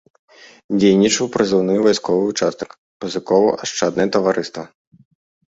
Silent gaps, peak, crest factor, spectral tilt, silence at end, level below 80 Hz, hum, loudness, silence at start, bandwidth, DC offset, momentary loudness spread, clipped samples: 2.78-3.00 s; -2 dBFS; 16 dB; -4.5 dB/octave; 0.95 s; -58 dBFS; none; -17 LUFS; 0.7 s; 8 kHz; under 0.1%; 16 LU; under 0.1%